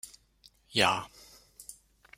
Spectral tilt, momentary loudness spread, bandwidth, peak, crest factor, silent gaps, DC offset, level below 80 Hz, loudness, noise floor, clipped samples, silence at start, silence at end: -2.5 dB/octave; 22 LU; 16 kHz; -8 dBFS; 28 dB; none; under 0.1%; -66 dBFS; -28 LUFS; -63 dBFS; under 0.1%; 0.05 s; 0.45 s